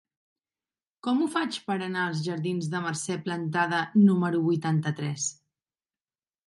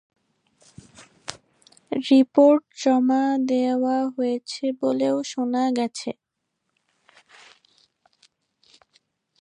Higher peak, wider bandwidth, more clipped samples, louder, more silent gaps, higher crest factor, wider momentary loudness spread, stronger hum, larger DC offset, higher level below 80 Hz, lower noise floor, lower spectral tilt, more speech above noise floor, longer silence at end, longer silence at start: second, -10 dBFS vs -4 dBFS; first, 11.5 kHz vs 10 kHz; neither; second, -27 LUFS vs -22 LUFS; neither; about the same, 18 dB vs 20 dB; second, 10 LU vs 18 LU; neither; neither; about the same, -76 dBFS vs -74 dBFS; first, under -90 dBFS vs -78 dBFS; about the same, -5.5 dB/octave vs -4.5 dB/octave; first, over 64 dB vs 58 dB; second, 1.15 s vs 3.3 s; about the same, 1.05 s vs 1 s